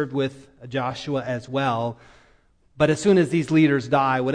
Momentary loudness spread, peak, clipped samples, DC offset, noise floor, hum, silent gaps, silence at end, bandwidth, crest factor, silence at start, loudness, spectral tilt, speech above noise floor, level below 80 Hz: 9 LU; -6 dBFS; under 0.1%; under 0.1%; -59 dBFS; none; none; 0 s; 10 kHz; 18 dB; 0 s; -22 LUFS; -6.5 dB/octave; 37 dB; -56 dBFS